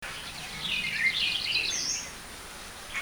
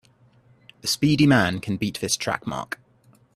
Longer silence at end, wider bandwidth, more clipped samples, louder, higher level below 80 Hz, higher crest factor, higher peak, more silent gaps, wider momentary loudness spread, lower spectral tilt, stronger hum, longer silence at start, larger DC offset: second, 0 s vs 0.7 s; first, over 20 kHz vs 14.5 kHz; neither; second, -28 LUFS vs -22 LUFS; about the same, -54 dBFS vs -54 dBFS; about the same, 16 dB vs 18 dB; second, -16 dBFS vs -6 dBFS; neither; about the same, 16 LU vs 14 LU; second, 0 dB/octave vs -4.5 dB/octave; neither; second, 0 s vs 0.85 s; neither